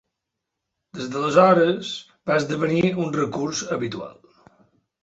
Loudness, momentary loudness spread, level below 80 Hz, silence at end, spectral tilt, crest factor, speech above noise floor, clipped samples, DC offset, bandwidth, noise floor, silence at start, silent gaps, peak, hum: -21 LUFS; 17 LU; -62 dBFS; 0.9 s; -5.5 dB/octave; 22 dB; 61 dB; under 0.1%; under 0.1%; 8 kHz; -82 dBFS; 0.95 s; none; -2 dBFS; none